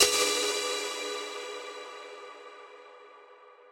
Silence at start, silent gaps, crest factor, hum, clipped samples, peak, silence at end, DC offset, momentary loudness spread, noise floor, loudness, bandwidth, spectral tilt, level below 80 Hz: 0 s; none; 26 dB; none; under 0.1%; -6 dBFS; 0 s; under 0.1%; 24 LU; -54 dBFS; -30 LUFS; 16 kHz; 1 dB/octave; -70 dBFS